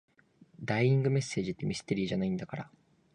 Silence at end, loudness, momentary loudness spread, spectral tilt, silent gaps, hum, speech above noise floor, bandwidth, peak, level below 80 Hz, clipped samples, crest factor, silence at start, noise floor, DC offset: 0.45 s; -31 LUFS; 16 LU; -6.5 dB/octave; none; none; 31 dB; 10 kHz; -16 dBFS; -62 dBFS; under 0.1%; 16 dB; 0.6 s; -62 dBFS; under 0.1%